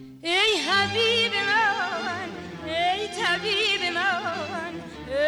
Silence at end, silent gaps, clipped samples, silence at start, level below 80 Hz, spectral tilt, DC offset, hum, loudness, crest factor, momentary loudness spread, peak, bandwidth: 0 s; none; under 0.1%; 0 s; -58 dBFS; -2.5 dB/octave; under 0.1%; none; -23 LUFS; 12 dB; 12 LU; -12 dBFS; over 20 kHz